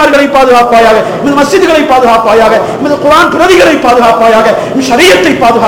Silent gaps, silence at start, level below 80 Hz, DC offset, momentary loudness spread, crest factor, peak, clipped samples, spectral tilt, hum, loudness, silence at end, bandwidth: none; 0 s; -34 dBFS; 0.9%; 5 LU; 4 dB; 0 dBFS; 20%; -4 dB/octave; none; -5 LUFS; 0 s; over 20 kHz